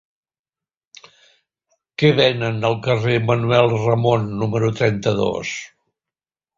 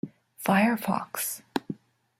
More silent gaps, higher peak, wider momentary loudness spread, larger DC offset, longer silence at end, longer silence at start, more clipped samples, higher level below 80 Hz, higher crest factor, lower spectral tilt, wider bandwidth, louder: neither; first, -2 dBFS vs -8 dBFS; second, 7 LU vs 18 LU; neither; first, 0.9 s vs 0.45 s; first, 2 s vs 0.05 s; neither; first, -52 dBFS vs -70 dBFS; about the same, 18 dB vs 20 dB; first, -6 dB/octave vs -4.5 dB/octave; second, 7.6 kHz vs 16.5 kHz; first, -18 LUFS vs -27 LUFS